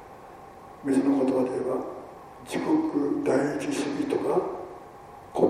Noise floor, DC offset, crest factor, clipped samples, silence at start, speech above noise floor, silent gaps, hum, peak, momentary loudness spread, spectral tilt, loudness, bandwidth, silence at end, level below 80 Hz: -46 dBFS; under 0.1%; 20 dB; under 0.1%; 0 s; 20 dB; none; none; -8 dBFS; 22 LU; -6 dB/octave; -27 LUFS; 14 kHz; 0 s; -62 dBFS